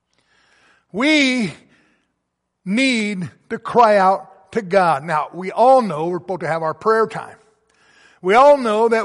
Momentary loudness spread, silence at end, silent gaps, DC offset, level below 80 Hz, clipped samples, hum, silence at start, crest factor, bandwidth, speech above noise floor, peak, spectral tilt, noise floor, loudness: 14 LU; 0 s; none; under 0.1%; -62 dBFS; under 0.1%; none; 0.95 s; 16 dB; 11.5 kHz; 58 dB; -2 dBFS; -5 dB/octave; -75 dBFS; -17 LUFS